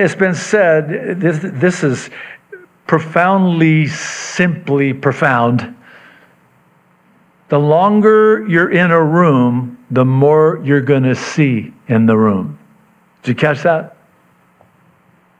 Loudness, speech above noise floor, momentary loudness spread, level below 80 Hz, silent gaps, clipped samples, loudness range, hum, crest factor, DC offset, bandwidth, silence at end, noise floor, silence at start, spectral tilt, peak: -13 LUFS; 40 dB; 11 LU; -62 dBFS; none; under 0.1%; 6 LU; none; 14 dB; under 0.1%; 10 kHz; 1.5 s; -52 dBFS; 0 s; -7 dB/octave; 0 dBFS